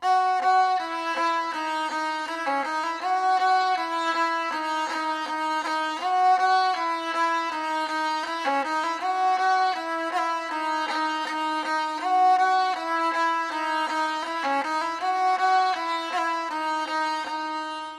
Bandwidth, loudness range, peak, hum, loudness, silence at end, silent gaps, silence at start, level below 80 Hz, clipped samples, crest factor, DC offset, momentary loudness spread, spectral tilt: 13 kHz; 1 LU; -12 dBFS; none; -25 LUFS; 0 s; none; 0 s; -72 dBFS; under 0.1%; 14 dB; under 0.1%; 6 LU; -1 dB/octave